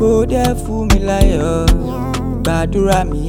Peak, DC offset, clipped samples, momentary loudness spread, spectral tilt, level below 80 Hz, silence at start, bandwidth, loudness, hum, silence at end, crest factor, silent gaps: 0 dBFS; under 0.1%; under 0.1%; 6 LU; -6 dB/octave; -18 dBFS; 0 s; 16.5 kHz; -16 LUFS; none; 0 s; 14 dB; none